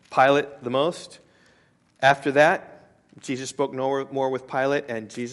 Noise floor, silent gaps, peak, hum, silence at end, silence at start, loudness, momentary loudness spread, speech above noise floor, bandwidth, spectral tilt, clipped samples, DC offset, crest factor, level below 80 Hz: -61 dBFS; none; -4 dBFS; none; 0 s; 0.1 s; -23 LUFS; 14 LU; 38 dB; 11.5 kHz; -4.5 dB/octave; under 0.1%; under 0.1%; 22 dB; -70 dBFS